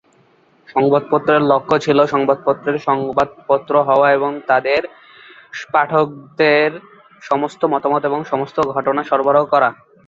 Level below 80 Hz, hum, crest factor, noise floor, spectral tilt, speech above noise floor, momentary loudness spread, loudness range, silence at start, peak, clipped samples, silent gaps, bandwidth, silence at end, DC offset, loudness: -58 dBFS; none; 16 dB; -54 dBFS; -6.5 dB/octave; 38 dB; 7 LU; 2 LU; 0.75 s; -2 dBFS; under 0.1%; none; 7.6 kHz; 0.35 s; under 0.1%; -16 LUFS